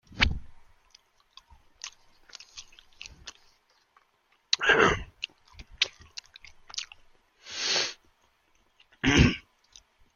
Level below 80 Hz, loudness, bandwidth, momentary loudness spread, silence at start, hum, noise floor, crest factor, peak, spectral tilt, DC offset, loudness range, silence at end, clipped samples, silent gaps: -42 dBFS; -26 LUFS; 7.4 kHz; 25 LU; 0.1 s; none; -69 dBFS; 30 dB; -2 dBFS; -3.5 dB/octave; under 0.1%; 19 LU; 0.75 s; under 0.1%; none